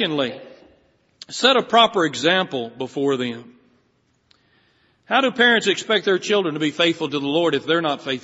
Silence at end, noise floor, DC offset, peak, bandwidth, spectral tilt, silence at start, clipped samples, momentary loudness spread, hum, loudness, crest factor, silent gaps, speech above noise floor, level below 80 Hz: 0.05 s; -64 dBFS; under 0.1%; -2 dBFS; 8 kHz; -1.5 dB/octave; 0 s; under 0.1%; 12 LU; none; -19 LUFS; 20 dB; none; 45 dB; -68 dBFS